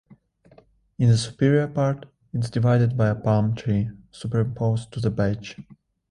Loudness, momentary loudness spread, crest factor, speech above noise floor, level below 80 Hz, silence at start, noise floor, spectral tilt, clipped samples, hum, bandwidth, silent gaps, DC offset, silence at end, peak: -23 LUFS; 13 LU; 16 dB; 34 dB; -50 dBFS; 1 s; -56 dBFS; -7.5 dB/octave; under 0.1%; none; 10.5 kHz; none; under 0.1%; 0.5 s; -6 dBFS